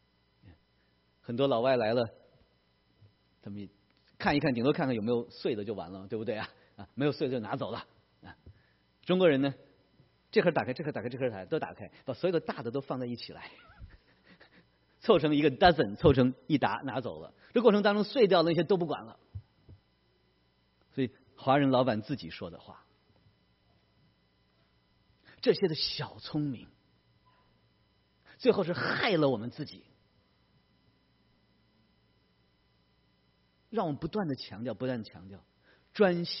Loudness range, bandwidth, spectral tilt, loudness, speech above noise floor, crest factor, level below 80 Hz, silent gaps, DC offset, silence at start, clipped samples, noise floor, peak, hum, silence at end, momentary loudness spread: 10 LU; 5.8 kHz; -4.5 dB/octave; -30 LUFS; 41 dB; 24 dB; -60 dBFS; none; under 0.1%; 1.3 s; under 0.1%; -70 dBFS; -8 dBFS; 60 Hz at -65 dBFS; 0 s; 20 LU